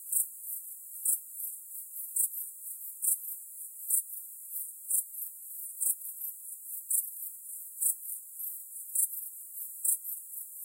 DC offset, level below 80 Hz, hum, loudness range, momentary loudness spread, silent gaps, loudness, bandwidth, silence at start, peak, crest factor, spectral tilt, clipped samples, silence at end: under 0.1%; under -90 dBFS; none; 1 LU; 11 LU; none; -33 LUFS; 16 kHz; 0 s; -12 dBFS; 24 dB; 6.5 dB/octave; under 0.1%; 0 s